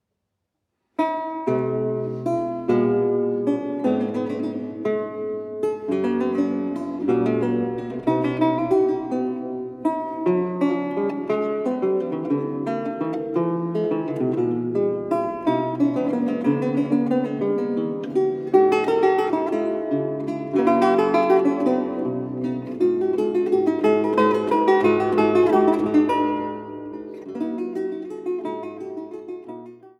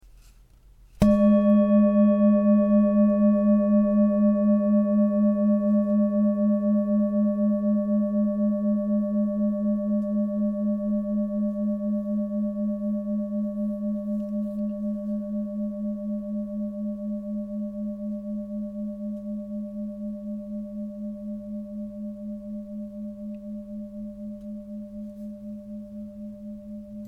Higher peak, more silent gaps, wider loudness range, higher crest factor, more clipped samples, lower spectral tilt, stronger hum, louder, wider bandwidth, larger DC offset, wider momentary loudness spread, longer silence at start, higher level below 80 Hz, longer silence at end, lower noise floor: about the same, -4 dBFS vs -6 dBFS; neither; second, 5 LU vs 16 LU; about the same, 18 dB vs 18 dB; neither; second, -8 dB/octave vs -10.5 dB/octave; neither; about the same, -22 LUFS vs -24 LUFS; first, 10 kHz vs 3.5 kHz; neither; second, 10 LU vs 18 LU; about the same, 1 s vs 1 s; second, -64 dBFS vs -52 dBFS; about the same, 0.1 s vs 0 s; first, -78 dBFS vs -53 dBFS